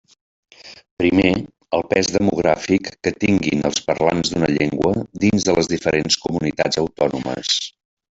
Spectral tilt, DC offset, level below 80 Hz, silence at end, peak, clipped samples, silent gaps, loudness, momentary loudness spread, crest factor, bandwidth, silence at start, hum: -4.5 dB/octave; under 0.1%; -48 dBFS; 0.45 s; -2 dBFS; under 0.1%; 0.91-0.97 s; -19 LUFS; 5 LU; 18 dB; 8.2 kHz; 0.65 s; none